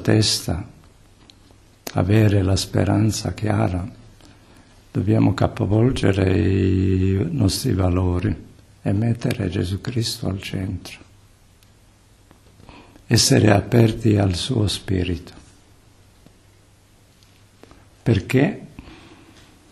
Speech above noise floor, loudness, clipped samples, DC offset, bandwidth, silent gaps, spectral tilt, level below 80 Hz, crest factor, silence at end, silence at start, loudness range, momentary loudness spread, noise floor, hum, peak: 34 dB; -20 LUFS; under 0.1%; under 0.1%; 13 kHz; none; -5.5 dB/octave; -42 dBFS; 20 dB; 0.75 s; 0 s; 9 LU; 13 LU; -53 dBFS; none; -2 dBFS